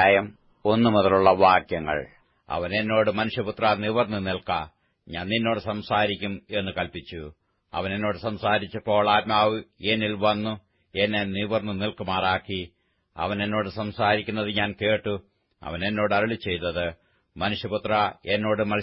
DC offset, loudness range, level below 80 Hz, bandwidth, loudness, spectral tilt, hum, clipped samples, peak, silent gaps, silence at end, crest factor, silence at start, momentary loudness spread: under 0.1%; 5 LU; -54 dBFS; 5.8 kHz; -25 LUFS; -10 dB/octave; none; under 0.1%; -4 dBFS; none; 0 s; 20 dB; 0 s; 13 LU